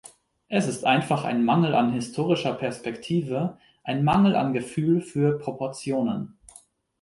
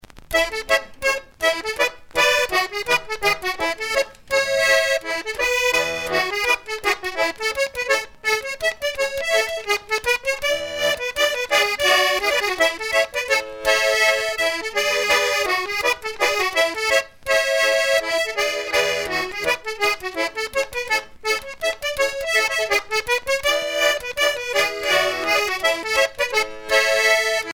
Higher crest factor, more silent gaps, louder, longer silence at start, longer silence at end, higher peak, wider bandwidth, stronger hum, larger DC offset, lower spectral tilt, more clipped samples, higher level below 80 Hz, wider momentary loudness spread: about the same, 18 dB vs 18 dB; neither; second, -25 LUFS vs -20 LUFS; first, 0.5 s vs 0.15 s; first, 0.75 s vs 0 s; about the same, -6 dBFS vs -4 dBFS; second, 11.5 kHz vs over 20 kHz; neither; neither; first, -6.5 dB/octave vs -0.5 dB/octave; neither; second, -58 dBFS vs -50 dBFS; first, 11 LU vs 6 LU